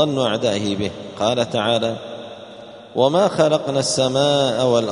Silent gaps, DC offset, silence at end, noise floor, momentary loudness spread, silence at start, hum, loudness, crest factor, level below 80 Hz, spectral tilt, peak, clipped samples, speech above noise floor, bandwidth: none; under 0.1%; 0 s; -39 dBFS; 17 LU; 0 s; none; -19 LUFS; 18 dB; -56 dBFS; -4.5 dB/octave; -2 dBFS; under 0.1%; 20 dB; 11 kHz